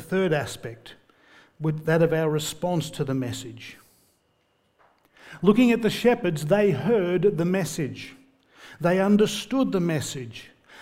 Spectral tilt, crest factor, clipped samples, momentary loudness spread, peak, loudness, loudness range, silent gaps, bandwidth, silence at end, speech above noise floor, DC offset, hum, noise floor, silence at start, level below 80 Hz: -6 dB/octave; 20 dB; under 0.1%; 19 LU; -4 dBFS; -24 LUFS; 5 LU; none; 16 kHz; 0 s; 45 dB; under 0.1%; none; -68 dBFS; 0 s; -58 dBFS